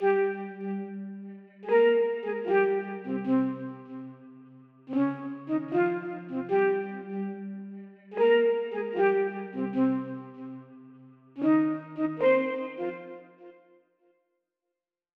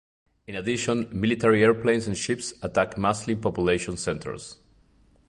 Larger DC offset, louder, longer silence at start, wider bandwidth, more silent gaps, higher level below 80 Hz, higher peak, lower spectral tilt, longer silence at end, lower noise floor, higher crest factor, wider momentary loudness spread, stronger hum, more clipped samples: neither; second, -28 LUFS vs -25 LUFS; second, 0 s vs 0.5 s; second, 4.8 kHz vs 11.5 kHz; neither; second, -86 dBFS vs -50 dBFS; second, -12 dBFS vs -6 dBFS; first, -9 dB/octave vs -5 dB/octave; first, 1.65 s vs 0.75 s; first, -87 dBFS vs -60 dBFS; about the same, 16 dB vs 20 dB; first, 19 LU vs 13 LU; neither; neither